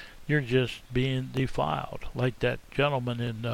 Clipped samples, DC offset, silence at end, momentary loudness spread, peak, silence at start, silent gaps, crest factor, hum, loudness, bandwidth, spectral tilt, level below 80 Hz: under 0.1%; under 0.1%; 0 s; 5 LU; -12 dBFS; 0 s; none; 16 dB; none; -29 LUFS; 13.5 kHz; -7 dB/octave; -46 dBFS